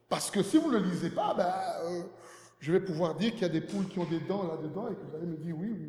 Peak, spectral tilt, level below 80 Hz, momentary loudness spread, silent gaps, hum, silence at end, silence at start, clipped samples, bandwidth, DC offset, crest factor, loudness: -14 dBFS; -6 dB/octave; -74 dBFS; 11 LU; none; none; 0 s; 0.1 s; under 0.1%; 14.5 kHz; under 0.1%; 18 dB; -32 LUFS